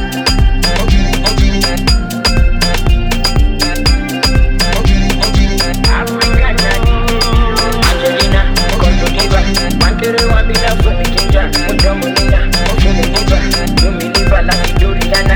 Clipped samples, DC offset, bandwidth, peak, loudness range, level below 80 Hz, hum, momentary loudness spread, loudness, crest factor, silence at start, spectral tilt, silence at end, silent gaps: under 0.1%; under 0.1%; 20 kHz; 0 dBFS; 1 LU; -12 dBFS; none; 2 LU; -12 LUFS; 10 dB; 0 s; -4.5 dB/octave; 0 s; none